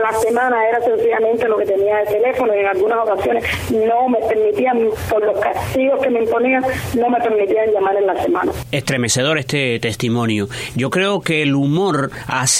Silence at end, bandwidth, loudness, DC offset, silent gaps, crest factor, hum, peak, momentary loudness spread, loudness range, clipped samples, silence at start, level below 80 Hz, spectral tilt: 0 s; 16 kHz; -17 LUFS; under 0.1%; none; 14 dB; none; -2 dBFS; 4 LU; 2 LU; under 0.1%; 0 s; -44 dBFS; -4.5 dB/octave